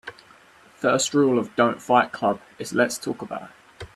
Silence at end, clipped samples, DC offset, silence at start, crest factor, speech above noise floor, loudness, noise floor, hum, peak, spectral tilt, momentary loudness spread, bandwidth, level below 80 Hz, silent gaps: 0.1 s; under 0.1%; under 0.1%; 0.05 s; 22 dB; 30 dB; -23 LUFS; -52 dBFS; none; -2 dBFS; -4 dB/octave; 15 LU; 14 kHz; -62 dBFS; none